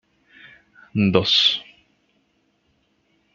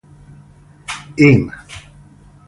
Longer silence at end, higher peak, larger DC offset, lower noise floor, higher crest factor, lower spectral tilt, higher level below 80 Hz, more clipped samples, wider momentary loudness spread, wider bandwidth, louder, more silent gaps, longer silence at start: first, 1.75 s vs 0.7 s; about the same, 0 dBFS vs 0 dBFS; neither; first, -66 dBFS vs -44 dBFS; first, 24 dB vs 18 dB; second, -5 dB/octave vs -7 dB/octave; second, -62 dBFS vs -44 dBFS; neither; second, 13 LU vs 24 LU; second, 7.4 kHz vs 11.5 kHz; second, -18 LUFS vs -14 LUFS; neither; about the same, 0.95 s vs 0.9 s